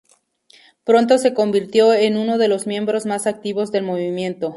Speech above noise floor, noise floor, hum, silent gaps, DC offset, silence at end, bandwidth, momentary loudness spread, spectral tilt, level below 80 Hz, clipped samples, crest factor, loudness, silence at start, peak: 39 dB; -56 dBFS; none; none; under 0.1%; 0 s; 11.5 kHz; 9 LU; -5 dB/octave; -66 dBFS; under 0.1%; 16 dB; -18 LUFS; 0.85 s; -2 dBFS